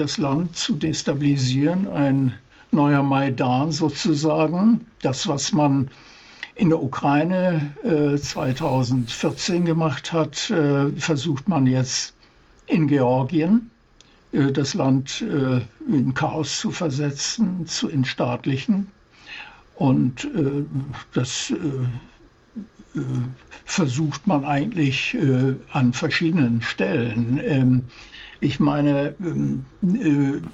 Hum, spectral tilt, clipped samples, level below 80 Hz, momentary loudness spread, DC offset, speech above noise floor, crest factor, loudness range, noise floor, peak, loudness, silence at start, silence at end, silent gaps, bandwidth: none; -6 dB/octave; under 0.1%; -52 dBFS; 8 LU; under 0.1%; 33 dB; 12 dB; 4 LU; -54 dBFS; -8 dBFS; -22 LUFS; 0 s; 0 s; none; 8.2 kHz